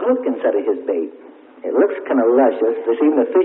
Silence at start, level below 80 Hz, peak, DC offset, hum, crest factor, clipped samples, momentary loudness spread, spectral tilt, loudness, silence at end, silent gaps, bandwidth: 0 s; -68 dBFS; -2 dBFS; under 0.1%; none; 14 dB; under 0.1%; 9 LU; -10 dB/octave; -17 LUFS; 0 s; none; 3.9 kHz